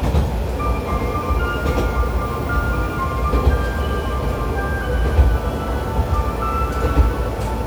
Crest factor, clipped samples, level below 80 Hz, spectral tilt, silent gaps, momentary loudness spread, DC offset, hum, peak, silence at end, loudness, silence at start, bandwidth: 16 dB; under 0.1%; -22 dBFS; -7 dB/octave; none; 4 LU; under 0.1%; none; -2 dBFS; 0 s; -21 LUFS; 0 s; over 20 kHz